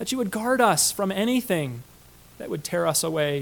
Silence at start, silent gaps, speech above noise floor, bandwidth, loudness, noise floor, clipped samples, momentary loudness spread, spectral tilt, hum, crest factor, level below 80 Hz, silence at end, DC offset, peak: 0 s; none; 27 dB; 19 kHz; -23 LUFS; -51 dBFS; under 0.1%; 14 LU; -3.5 dB/octave; 60 Hz at -50 dBFS; 18 dB; -58 dBFS; 0 s; under 0.1%; -6 dBFS